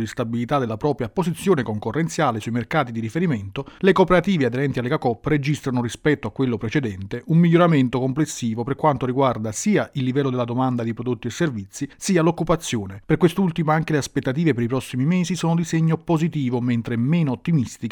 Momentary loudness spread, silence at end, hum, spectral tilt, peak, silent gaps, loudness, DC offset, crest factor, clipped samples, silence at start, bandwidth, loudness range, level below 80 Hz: 7 LU; 0 s; none; -6.5 dB/octave; -4 dBFS; none; -21 LUFS; under 0.1%; 18 dB; under 0.1%; 0 s; 18 kHz; 2 LU; -48 dBFS